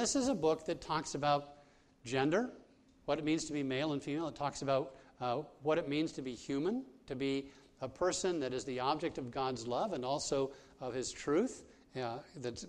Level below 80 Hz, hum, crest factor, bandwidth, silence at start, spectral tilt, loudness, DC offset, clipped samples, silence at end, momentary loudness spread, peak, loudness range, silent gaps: -66 dBFS; none; 20 dB; 11.5 kHz; 0 s; -4.5 dB/octave; -37 LUFS; under 0.1%; under 0.1%; 0 s; 10 LU; -18 dBFS; 1 LU; none